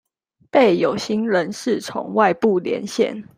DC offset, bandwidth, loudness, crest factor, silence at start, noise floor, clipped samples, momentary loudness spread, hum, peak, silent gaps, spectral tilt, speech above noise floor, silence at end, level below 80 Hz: under 0.1%; 16 kHz; -19 LUFS; 18 dB; 0.55 s; -49 dBFS; under 0.1%; 7 LU; none; -2 dBFS; none; -5 dB/octave; 30 dB; 0.15 s; -64 dBFS